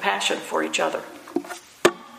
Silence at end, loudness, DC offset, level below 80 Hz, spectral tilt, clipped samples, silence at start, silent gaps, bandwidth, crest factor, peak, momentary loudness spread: 0 s; -25 LUFS; under 0.1%; -68 dBFS; -2 dB/octave; under 0.1%; 0 s; none; 15.5 kHz; 24 dB; 0 dBFS; 10 LU